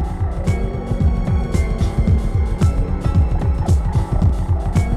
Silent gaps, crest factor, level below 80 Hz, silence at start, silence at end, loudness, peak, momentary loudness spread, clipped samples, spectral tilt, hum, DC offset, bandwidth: none; 12 dB; -20 dBFS; 0 s; 0 s; -19 LUFS; -4 dBFS; 3 LU; under 0.1%; -8 dB/octave; none; under 0.1%; 11.5 kHz